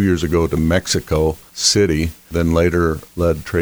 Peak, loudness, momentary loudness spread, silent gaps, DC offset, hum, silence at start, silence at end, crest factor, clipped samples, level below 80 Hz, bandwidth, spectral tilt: -2 dBFS; -17 LUFS; 6 LU; none; under 0.1%; none; 0 s; 0 s; 14 dB; under 0.1%; -30 dBFS; over 20 kHz; -4.5 dB/octave